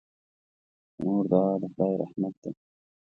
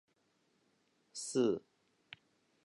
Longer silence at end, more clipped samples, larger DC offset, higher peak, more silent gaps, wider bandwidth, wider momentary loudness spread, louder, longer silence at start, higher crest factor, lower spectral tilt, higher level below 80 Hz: second, 0.6 s vs 1.05 s; neither; neither; first, -8 dBFS vs -20 dBFS; first, 2.37-2.42 s vs none; second, 6.6 kHz vs 11.5 kHz; second, 17 LU vs 22 LU; first, -28 LUFS vs -37 LUFS; second, 1 s vs 1.15 s; about the same, 22 dB vs 22 dB; first, -11.5 dB/octave vs -4.5 dB/octave; first, -68 dBFS vs -84 dBFS